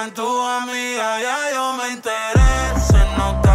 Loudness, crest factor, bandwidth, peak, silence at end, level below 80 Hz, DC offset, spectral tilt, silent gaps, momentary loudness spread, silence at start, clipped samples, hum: -19 LUFS; 12 dB; 15.5 kHz; -6 dBFS; 0 s; -20 dBFS; under 0.1%; -5 dB/octave; none; 6 LU; 0 s; under 0.1%; none